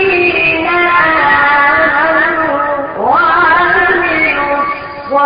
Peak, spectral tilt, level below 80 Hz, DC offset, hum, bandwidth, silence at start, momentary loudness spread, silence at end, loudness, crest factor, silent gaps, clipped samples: 0 dBFS; -8.5 dB/octave; -40 dBFS; under 0.1%; none; 5.2 kHz; 0 s; 7 LU; 0 s; -9 LUFS; 10 dB; none; under 0.1%